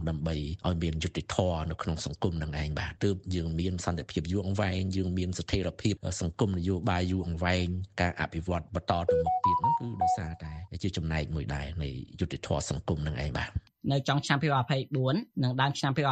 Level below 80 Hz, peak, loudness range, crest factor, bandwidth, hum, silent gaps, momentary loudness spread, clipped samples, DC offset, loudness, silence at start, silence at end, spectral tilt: -44 dBFS; -10 dBFS; 4 LU; 20 dB; 9.2 kHz; none; none; 7 LU; under 0.1%; under 0.1%; -31 LUFS; 0 s; 0 s; -6 dB/octave